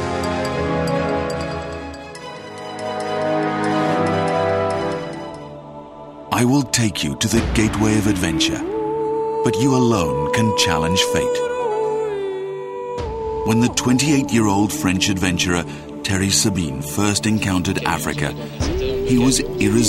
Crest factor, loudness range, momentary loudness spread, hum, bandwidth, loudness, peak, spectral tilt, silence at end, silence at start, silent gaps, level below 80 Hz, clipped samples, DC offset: 18 dB; 4 LU; 13 LU; none; 16.5 kHz; -19 LUFS; 0 dBFS; -4.5 dB/octave; 0 s; 0 s; none; -38 dBFS; under 0.1%; under 0.1%